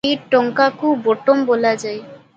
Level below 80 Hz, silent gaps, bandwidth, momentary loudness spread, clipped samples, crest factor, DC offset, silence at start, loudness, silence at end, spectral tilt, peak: -64 dBFS; none; 8.8 kHz; 9 LU; under 0.1%; 16 dB; under 0.1%; 0.05 s; -17 LUFS; 0.2 s; -4.5 dB/octave; 0 dBFS